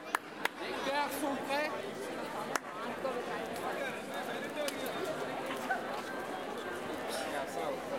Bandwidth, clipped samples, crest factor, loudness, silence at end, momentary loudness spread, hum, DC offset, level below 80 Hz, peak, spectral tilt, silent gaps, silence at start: 16.5 kHz; under 0.1%; 26 dB; -37 LUFS; 0 s; 5 LU; none; under 0.1%; -72 dBFS; -12 dBFS; -3 dB/octave; none; 0 s